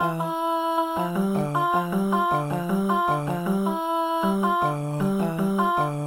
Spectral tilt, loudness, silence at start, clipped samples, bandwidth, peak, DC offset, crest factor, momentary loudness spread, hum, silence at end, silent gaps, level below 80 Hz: -7 dB/octave; -24 LUFS; 0 s; under 0.1%; 16 kHz; -10 dBFS; under 0.1%; 14 dB; 3 LU; none; 0 s; none; -56 dBFS